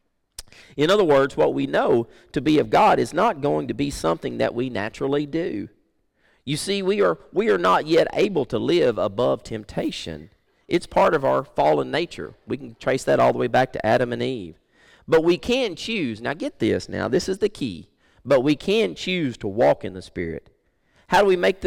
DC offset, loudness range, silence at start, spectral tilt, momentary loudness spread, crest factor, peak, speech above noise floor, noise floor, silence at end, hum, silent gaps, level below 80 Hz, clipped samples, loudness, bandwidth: under 0.1%; 4 LU; 0.4 s; -5.5 dB/octave; 13 LU; 12 dB; -10 dBFS; 44 dB; -65 dBFS; 0 s; none; none; -50 dBFS; under 0.1%; -22 LUFS; 16.5 kHz